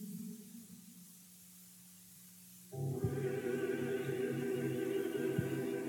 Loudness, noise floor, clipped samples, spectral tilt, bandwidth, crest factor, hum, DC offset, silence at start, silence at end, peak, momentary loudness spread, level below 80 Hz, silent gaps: -39 LUFS; -58 dBFS; under 0.1%; -6.5 dB/octave; 19 kHz; 18 dB; none; under 0.1%; 0 s; 0 s; -22 dBFS; 18 LU; -70 dBFS; none